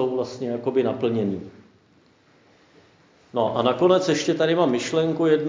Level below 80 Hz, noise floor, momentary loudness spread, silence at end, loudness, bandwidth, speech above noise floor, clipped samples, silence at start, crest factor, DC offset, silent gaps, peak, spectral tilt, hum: -64 dBFS; -58 dBFS; 9 LU; 0 s; -22 LUFS; 7.6 kHz; 37 dB; under 0.1%; 0 s; 18 dB; under 0.1%; none; -4 dBFS; -5.5 dB/octave; none